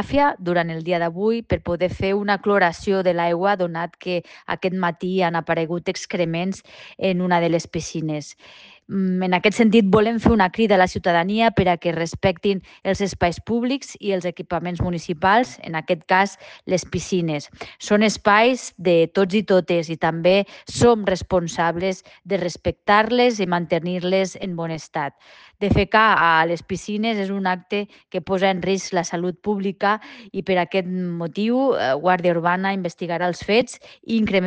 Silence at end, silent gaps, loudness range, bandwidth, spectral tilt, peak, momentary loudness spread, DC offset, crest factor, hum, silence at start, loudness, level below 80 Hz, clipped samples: 0 s; none; 5 LU; 9.6 kHz; -5.5 dB/octave; -4 dBFS; 10 LU; under 0.1%; 16 dB; none; 0 s; -21 LUFS; -44 dBFS; under 0.1%